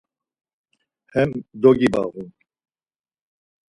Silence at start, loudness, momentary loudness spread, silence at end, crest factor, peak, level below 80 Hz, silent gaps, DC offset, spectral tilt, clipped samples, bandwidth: 1.15 s; -20 LUFS; 19 LU; 1.4 s; 22 dB; -2 dBFS; -54 dBFS; none; under 0.1%; -7.5 dB/octave; under 0.1%; 11 kHz